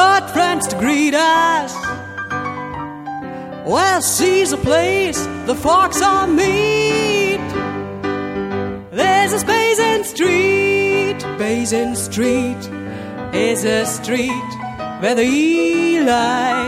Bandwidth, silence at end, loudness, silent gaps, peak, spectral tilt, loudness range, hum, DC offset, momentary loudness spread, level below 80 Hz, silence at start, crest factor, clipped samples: 16 kHz; 0 s; -16 LUFS; none; -2 dBFS; -3.5 dB/octave; 4 LU; none; under 0.1%; 13 LU; -44 dBFS; 0 s; 14 dB; under 0.1%